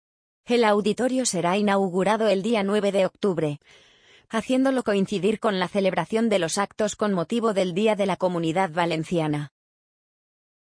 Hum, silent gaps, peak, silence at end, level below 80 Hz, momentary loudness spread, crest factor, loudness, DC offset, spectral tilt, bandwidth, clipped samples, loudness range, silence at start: none; none; -8 dBFS; 1.15 s; -64 dBFS; 4 LU; 16 dB; -23 LUFS; under 0.1%; -5 dB/octave; 10.5 kHz; under 0.1%; 2 LU; 0.5 s